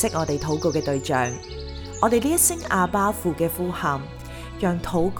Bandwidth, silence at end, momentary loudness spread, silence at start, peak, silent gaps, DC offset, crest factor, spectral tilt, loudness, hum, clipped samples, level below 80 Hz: over 20 kHz; 0 s; 16 LU; 0 s; -4 dBFS; none; under 0.1%; 18 dB; -4.5 dB/octave; -23 LUFS; none; under 0.1%; -40 dBFS